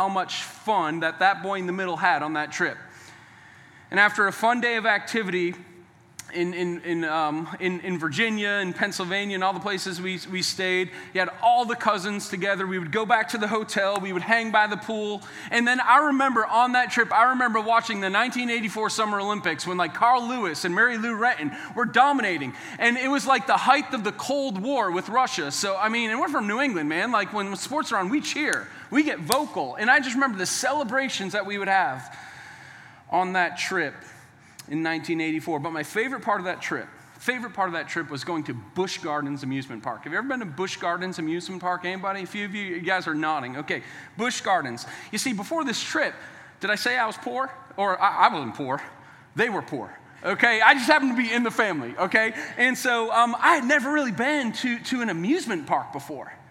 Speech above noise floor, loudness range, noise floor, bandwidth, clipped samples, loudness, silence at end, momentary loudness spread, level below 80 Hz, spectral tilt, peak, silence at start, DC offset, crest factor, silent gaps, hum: 25 dB; 7 LU; -50 dBFS; 16 kHz; under 0.1%; -24 LUFS; 0.1 s; 11 LU; -76 dBFS; -3.5 dB/octave; 0 dBFS; 0 s; under 0.1%; 24 dB; none; none